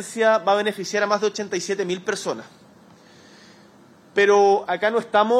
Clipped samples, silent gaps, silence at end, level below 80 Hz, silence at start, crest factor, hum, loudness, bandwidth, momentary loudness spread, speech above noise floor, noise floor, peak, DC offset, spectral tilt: under 0.1%; none; 0 s; -72 dBFS; 0 s; 16 dB; none; -21 LUFS; 13 kHz; 10 LU; 30 dB; -51 dBFS; -6 dBFS; under 0.1%; -3.5 dB/octave